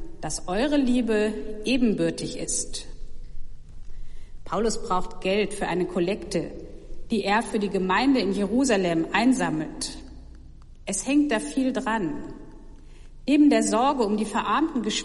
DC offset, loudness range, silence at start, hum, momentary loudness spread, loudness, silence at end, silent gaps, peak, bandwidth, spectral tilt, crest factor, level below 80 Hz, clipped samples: under 0.1%; 6 LU; 0 s; none; 12 LU; -24 LUFS; 0 s; none; -8 dBFS; 11.5 kHz; -4.5 dB/octave; 16 dB; -40 dBFS; under 0.1%